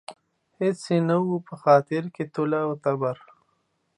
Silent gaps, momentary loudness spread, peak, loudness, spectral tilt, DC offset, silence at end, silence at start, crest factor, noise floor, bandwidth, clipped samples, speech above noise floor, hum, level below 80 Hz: none; 10 LU; -6 dBFS; -24 LUFS; -7.5 dB/octave; under 0.1%; 0.85 s; 0.1 s; 20 dB; -71 dBFS; 11 kHz; under 0.1%; 48 dB; none; -76 dBFS